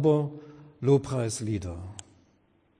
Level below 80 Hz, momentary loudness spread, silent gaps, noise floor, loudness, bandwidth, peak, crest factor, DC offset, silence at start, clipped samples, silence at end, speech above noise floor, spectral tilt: -56 dBFS; 19 LU; none; -66 dBFS; -28 LUFS; 10.5 kHz; -12 dBFS; 18 dB; under 0.1%; 0 s; under 0.1%; 0.8 s; 40 dB; -7 dB/octave